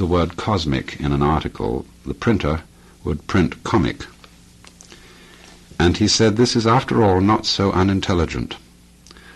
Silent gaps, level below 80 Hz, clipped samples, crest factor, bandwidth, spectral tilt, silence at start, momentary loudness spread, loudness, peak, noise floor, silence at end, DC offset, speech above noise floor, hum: none; -36 dBFS; under 0.1%; 16 dB; 12.5 kHz; -5.5 dB/octave; 0 s; 13 LU; -19 LUFS; -4 dBFS; -47 dBFS; 0.05 s; under 0.1%; 29 dB; none